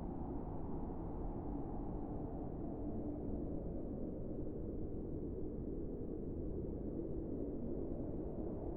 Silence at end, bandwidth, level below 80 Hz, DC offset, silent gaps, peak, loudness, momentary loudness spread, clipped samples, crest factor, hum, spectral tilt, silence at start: 0 s; 2.6 kHz; -48 dBFS; under 0.1%; none; -30 dBFS; -45 LUFS; 2 LU; under 0.1%; 12 dB; none; -13 dB/octave; 0 s